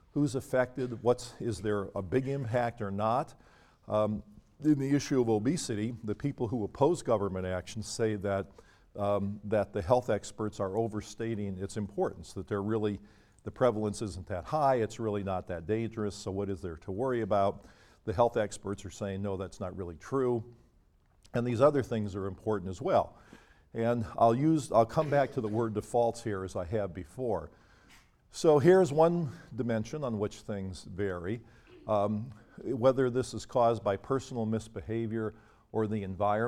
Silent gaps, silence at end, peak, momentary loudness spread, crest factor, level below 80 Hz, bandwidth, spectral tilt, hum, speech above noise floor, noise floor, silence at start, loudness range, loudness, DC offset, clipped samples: none; 0 s; -10 dBFS; 12 LU; 20 dB; -58 dBFS; 14.5 kHz; -6.5 dB/octave; none; 35 dB; -65 dBFS; 0.15 s; 5 LU; -31 LUFS; under 0.1%; under 0.1%